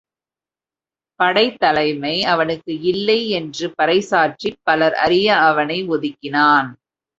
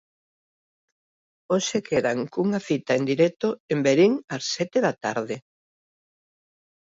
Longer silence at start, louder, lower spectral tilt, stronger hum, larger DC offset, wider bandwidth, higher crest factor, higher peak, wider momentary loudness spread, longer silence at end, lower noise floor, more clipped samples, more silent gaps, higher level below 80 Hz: second, 1.2 s vs 1.5 s; first, -17 LUFS vs -24 LUFS; about the same, -4.5 dB/octave vs -5 dB/octave; neither; neither; about the same, 8 kHz vs 8 kHz; about the same, 18 dB vs 18 dB; first, 0 dBFS vs -8 dBFS; about the same, 8 LU vs 9 LU; second, 0.45 s vs 1.45 s; about the same, under -90 dBFS vs under -90 dBFS; neither; second, none vs 3.60-3.68 s, 4.24-4.28 s; first, -58 dBFS vs -68 dBFS